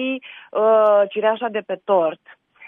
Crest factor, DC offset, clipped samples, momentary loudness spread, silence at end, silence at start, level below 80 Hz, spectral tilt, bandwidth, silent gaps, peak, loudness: 14 dB; under 0.1%; under 0.1%; 12 LU; 0 s; 0 s; -78 dBFS; -7.5 dB/octave; 3.8 kHz; none; -6 dBFS; -19 LUFS